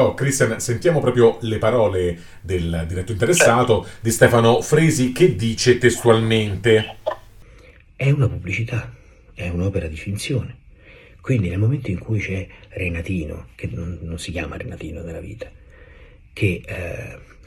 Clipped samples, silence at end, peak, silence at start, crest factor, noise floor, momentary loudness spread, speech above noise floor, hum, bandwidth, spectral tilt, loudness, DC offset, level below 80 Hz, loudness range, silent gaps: under 0.1%; 0.25 s; 0 dBFS; 0 s; 20 dB; -46 dBFS; 17 LU; 27 dB; none; 17.5 kHz; -5.5 dB/octave; -19 LUFS; under 0.1%; -40 dBFS; 12 LU; none